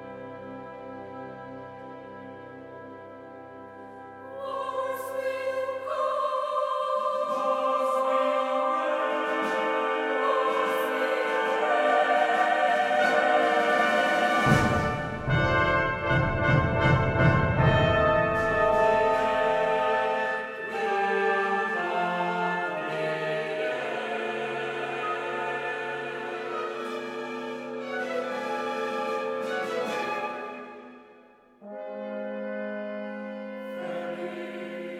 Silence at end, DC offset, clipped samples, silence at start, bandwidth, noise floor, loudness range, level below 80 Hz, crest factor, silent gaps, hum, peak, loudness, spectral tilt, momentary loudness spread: 0 s; under 0.1%; under 0.1%; 0 s; 15.5 kHz; -55 dBFS; 13 LU; -48 dBFS; 20 dB; none; none; -8 dBFS; -26 LUFS; -6 dB/octave; 18 LU